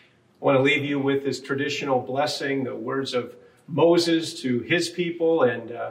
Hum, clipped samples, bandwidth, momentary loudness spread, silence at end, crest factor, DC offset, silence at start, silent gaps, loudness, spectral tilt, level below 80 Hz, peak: none; under 0.1%; 15.5 kHz; 9 LU; 0 s; 18 dB; under 0.1%; 0.4 s; none; -24 LUFS; -5 dB/octave; -72 dBFS; -6 dBFS